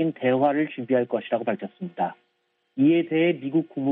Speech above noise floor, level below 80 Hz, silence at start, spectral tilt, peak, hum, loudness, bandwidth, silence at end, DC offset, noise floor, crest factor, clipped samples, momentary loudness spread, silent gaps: 32 dB; -74 dBFS; 0 s; -10.5 dB/octave; -8 dBFS; none; -24 LUFS; 3.9 kHz; 0 s; under 0.1%; -55 dBFS; 16 dB; under 0.1%; 9 LU; none